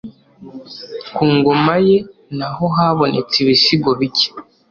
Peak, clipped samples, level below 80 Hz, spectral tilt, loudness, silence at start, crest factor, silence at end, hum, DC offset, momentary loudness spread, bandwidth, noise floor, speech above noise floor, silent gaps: -2 dBFS; under 0.1%; -52 dBFS; -6 dB/octave; -14 LUFS; 0.05 s; 14 dB; 0.3 s; none; under 0.1%; 17 LU; 7.2 kHz; -36 dBFS; 21 dB; none